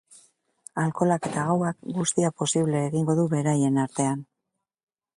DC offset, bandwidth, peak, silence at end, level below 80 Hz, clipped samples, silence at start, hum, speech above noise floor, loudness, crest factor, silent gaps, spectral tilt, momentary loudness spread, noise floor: under 0.1%; 11.5 kHz; -8 dBFS; 0.95 s; -66 dBFS; under 0.1%; 0.75 s; none; 58 dB; -25 LUFS; 18 dB; none; -5.5 dB/octave; 5 LU; -83 dBFS